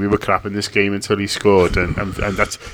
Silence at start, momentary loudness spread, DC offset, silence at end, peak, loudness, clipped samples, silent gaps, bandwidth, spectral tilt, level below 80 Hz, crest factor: 0 s; 7 LU; under 0.1%; 0 s; 0 dBFS; -18 LUFS; under 0.1%; none; 17.5 kHz; -5 dB/octave; -32 dBFS; 18 dB